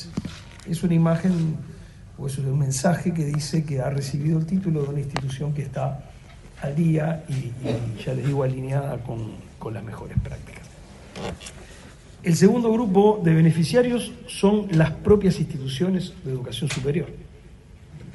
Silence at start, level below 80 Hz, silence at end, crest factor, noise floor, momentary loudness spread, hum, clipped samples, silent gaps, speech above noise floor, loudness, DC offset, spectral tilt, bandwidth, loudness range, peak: 0 s; -44 dBFS; 0 s; 20 dB; -46 dBFS; 18 LU; none; under 0.1%; none; 23 dB; -23 LUFS; under 0.1%; -7 dB/octave; 11.5 kHz; 9 LU; -4 dBFS